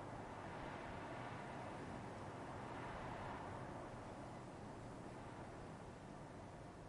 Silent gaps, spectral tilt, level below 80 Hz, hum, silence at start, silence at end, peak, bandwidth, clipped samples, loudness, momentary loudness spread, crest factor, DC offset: none; -6 dB/octave; -66 dBFS; none; 0 s; 0 s; -38 dBFS; 11.5 kHz; under 0.1%; -52 LUFS; 5 LU; 14 dB; under 0.1%